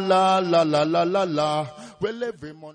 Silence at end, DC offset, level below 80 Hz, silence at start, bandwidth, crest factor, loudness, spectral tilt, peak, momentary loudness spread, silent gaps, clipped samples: 0 s; under 0.1%; -62 dBFS; 0 s; 10 kHz; 14 dB; -22 LUFS; -5.5 dB/octave; -8 dBFS; 13 LU; none; under 0.1%